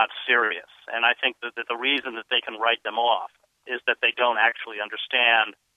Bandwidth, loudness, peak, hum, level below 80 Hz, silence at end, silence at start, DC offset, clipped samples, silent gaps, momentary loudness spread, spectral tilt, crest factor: 9 kHz; -23 LUFS; -4 dBFS; none; -82 dBFS; 0.25 s; 0 s; under 0.1%; under 0.1%; none; 12 LU; -2.5 dB/octave; 20 dB